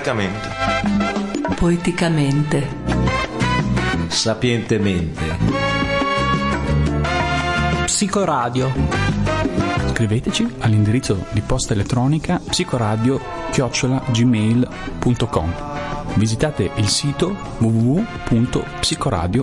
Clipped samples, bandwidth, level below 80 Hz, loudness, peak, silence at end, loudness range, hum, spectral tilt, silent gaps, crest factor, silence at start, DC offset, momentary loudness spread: under 0.1%; 11.5 kHz; -32 dBFS; -19 LUFS; -4 dBFS; 0 s; 1 LU; none; -5 dB/octave; none; 16 dB; 0 s; under 0.1%; 5 LU